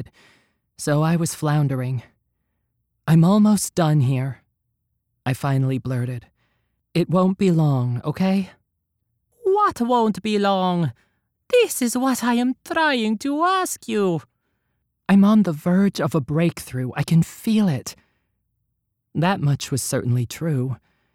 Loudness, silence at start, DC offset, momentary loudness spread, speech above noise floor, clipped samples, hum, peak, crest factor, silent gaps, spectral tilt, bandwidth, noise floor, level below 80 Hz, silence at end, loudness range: -21 LUFS; 0 s; under 0.1%; 11 LU; 55 dB; under 0.1%; none; -6 dBFS; 14 dB; none; -6 dB/octave; 16.5 kHz; -75 dBFS; -58 dBFS; 0.4 s; 4 LU